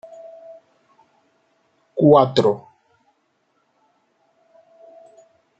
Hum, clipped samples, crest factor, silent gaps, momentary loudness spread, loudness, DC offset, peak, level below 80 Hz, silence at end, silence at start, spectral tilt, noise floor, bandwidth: none; under 0.1%; 22 dB; none; 28 LU; -17 LUFS; under 0.1%; -2 dBFS; -66 dBFS; 3 s; 0.25 s; -7.5 dB/octave; -67 dBFS; 8.2 kHz